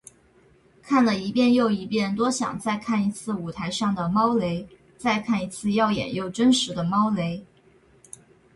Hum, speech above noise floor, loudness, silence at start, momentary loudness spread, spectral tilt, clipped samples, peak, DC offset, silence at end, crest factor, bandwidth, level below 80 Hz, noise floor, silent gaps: none; 34 dB; -24 LUFS; 0.85 s; 9 LU; -5 dB/octave; under 0.1%; -10 dBFS; under 0.1%; 1.1 s; 14 dB; 11.5 kHz; -58 dBFS; -58 dBFS; none